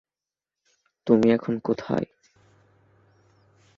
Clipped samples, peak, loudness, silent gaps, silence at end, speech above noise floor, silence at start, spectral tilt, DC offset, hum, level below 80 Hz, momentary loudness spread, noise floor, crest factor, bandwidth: under 0.1%; -6 dBFS; -24 LUFS; none; 1.75 s; over 68 dB; 1.05 s; -8 dB/octave; under 0.1%; none; -64 dBFS; 15 LU; under -90 dBFS; 22 dB; 7 kHz